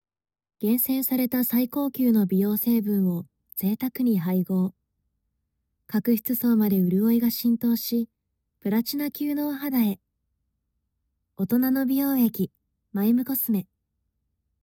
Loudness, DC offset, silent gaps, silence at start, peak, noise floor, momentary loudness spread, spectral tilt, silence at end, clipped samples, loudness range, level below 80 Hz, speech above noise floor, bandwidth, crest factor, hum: -24 LUFS; under 0.1%; none; 0.6 s; -12 dBFS; -77 dBFS; 8 LU; -6.5 dB/octave; 1 s; under 0.1%; 4 LU; -68 dBFS; 54 dB; 18 kHz; 14 dB; none